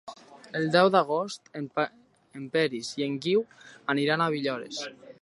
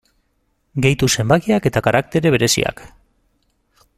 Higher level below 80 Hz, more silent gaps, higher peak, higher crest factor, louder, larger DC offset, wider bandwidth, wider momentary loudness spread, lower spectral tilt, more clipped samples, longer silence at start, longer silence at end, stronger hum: second, -76 dBFS vs -44 dBFS; neither; second, -8 dBFS vs 0 dBFS; about the same, 22 dB vs 18 dB; second, -27 LUFS vs -16 LUFS; neither; second, 11.5 kHz vs 15.5 kHz; first, 16 LU vs 4 LU; about the same, -5 dB/octave vs -4.5 dB/octave; neither; second, 0.05 s vs 0.75 s; second, 0.1 s vs 1.1 s; neither